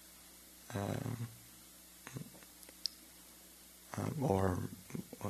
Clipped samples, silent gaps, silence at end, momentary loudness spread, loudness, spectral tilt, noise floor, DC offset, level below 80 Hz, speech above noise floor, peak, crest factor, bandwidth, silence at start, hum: under 0.1%; none; 0 s; 20 LU; -40 LUFS; -5.5 dB/octave; -58 dBFS; under 0.1%; -66 dBFS; 22 dB; -16 dBFS; 26 dB; 13.5 kHz; 0 s; none